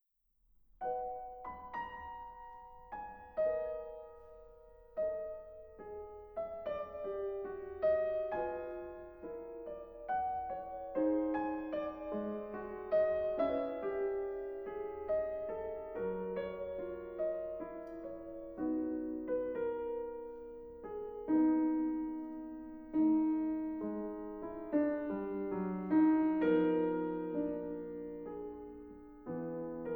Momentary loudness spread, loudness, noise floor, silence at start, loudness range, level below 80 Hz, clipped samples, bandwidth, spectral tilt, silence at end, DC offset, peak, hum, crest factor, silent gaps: 16 LU; -38 LUFS; -76 dBFS; 0.8 s; 9 LU; -64 dBFS; under 0.1%; 4.1 kHz; -10 dB/octave; 0 s; under 0.1%; -20 dBFS; none; 18 dB; none